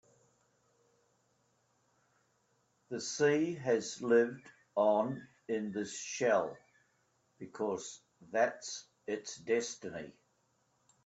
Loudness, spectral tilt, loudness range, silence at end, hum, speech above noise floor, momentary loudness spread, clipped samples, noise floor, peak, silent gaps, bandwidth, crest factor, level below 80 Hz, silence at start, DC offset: -34 LUFS; -4 dB/octave; 6 LU; 0.95 s; none; 42 dB; 16 LU; under 0.1%; -76 dBFS; -16 dBFS; none; 8.2 kHz; 22 dB; -82 dBFS; 2.9 s; under 0.1%